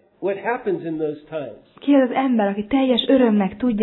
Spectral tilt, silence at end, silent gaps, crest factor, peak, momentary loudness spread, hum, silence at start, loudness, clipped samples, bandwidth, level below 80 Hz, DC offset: -9.5 dB/octave; 0 s; none; 16 dB; -4 dBFS; 13 LU; none; 0.2 s; -20 LUFS; under 0.1%; 4.2 kHz; -54 dBFS; under 0.1%